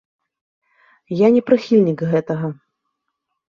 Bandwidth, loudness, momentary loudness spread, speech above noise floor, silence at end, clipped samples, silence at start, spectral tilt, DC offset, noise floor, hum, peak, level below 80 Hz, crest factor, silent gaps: 7.2 kHz; -17 LUFS; 12 LU; 60 dB; 0.95 s; under 0.1%; 1.1 s; -8.5 dB/octave; under 0.1%; -76 dBFS; none; -2 dBFS; -62 dBFS; 18 dB; none